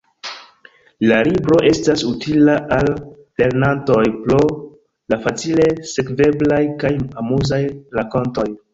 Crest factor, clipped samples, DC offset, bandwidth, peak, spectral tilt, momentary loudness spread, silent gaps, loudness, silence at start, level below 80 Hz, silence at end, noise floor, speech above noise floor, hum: 16 dB; under 0.1%; under 0.1%; 7.8 kHz; -2 dBFS; -6 dB/octave; 10 LU; none; -17 LUFS; 0.25 s; -42 dBFS; 0.15 s; -49 dBFS; 33 dB; none